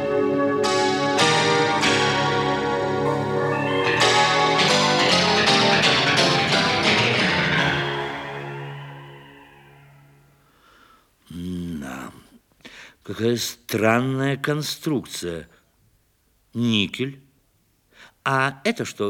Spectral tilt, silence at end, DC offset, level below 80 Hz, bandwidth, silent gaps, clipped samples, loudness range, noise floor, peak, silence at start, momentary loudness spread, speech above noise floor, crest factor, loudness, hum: -4 dB/octave; 0 s; under 0.1%; -56 dBFS; 18 kHz; none; under 0.1%; 20 LU; -64 dBFS; -4 dBFS; 0 s; 16 LU; 41 dB; 18 dB; -20 LUFS; none